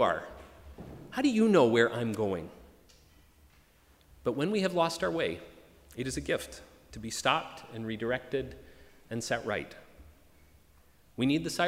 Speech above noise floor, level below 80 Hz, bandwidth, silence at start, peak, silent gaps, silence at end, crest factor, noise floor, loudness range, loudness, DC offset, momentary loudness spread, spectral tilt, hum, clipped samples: 32 dB; -58 dBFS; 16 kHz; 0 s; -10 dBFS; none; 0 s; 22 dB; -62 dBFS; 7 LU; -31 LUFS; under 0.1%; 23 LU; -5 dB/octave; none; under 0.1%